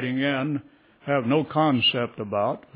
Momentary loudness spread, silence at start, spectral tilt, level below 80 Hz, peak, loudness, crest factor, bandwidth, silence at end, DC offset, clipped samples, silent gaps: 10 LU; 0 s; -9.5 dB/octave; -64 dBFS; -10 dBFS; -24 LUFS; 16 dB; 4 kHz; 0.15 s; under 0.1%; under 0.1%; none